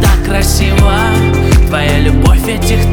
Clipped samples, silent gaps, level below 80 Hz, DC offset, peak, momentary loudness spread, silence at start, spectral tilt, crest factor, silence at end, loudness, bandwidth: under 0.1%; none; -12 dBFS; under 0.1%; 0 dBFS; 2 LU; 0 s; -5.5 dB/octave; 8 dB; 0 s; -10 LUFS; 19.5 kHz